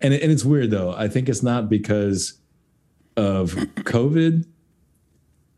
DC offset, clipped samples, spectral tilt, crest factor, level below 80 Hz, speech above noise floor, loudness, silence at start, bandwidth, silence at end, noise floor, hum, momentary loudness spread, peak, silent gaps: under 0.1%; under 0.1%; -6.5 dB/octave; 16 dB; -52 dBFS; 43 dB; -21 LUFS; 0 s; 12.5 kHz; 1.15 s; -62 dBFS; none; 8 LU; -6 dBFS; none